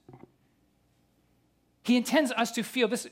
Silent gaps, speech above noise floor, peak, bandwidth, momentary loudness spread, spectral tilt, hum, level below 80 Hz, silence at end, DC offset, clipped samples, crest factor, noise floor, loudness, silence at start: none; 42 dB; -12 dBFS; 16.5 kHz; 5 LU; -3.5 dB/octave; 60 Hz at -70 dBFS; -76 dBFS; 0.05 s; under 0.1%; under 0.1%; 20 dB; -69 dBFS; -27 LUFS; 0.1 s